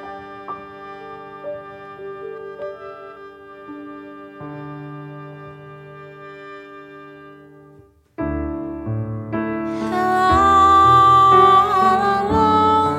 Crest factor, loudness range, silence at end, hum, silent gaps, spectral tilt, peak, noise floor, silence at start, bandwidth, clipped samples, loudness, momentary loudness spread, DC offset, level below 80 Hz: 18 dB; 22 LU; 0 s; none; none; -6 dB/octave; -2 dBFS; -49 dBFS; 0 s; 13 kHz; under 0.1%; -15 LUFS; 27 LU; under 0.1%; -42 dBFS